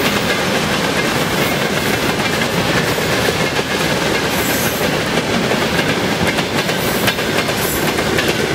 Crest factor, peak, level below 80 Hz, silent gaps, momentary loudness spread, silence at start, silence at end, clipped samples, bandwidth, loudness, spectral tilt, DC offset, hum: 16 dB; 0 dBFS; -40 dBFS; none; 1 LU; 0 s; 0 s; under 0.1%; 16 kHz; -16 LUFS; -3.5 dB/octave; under 0.1%; none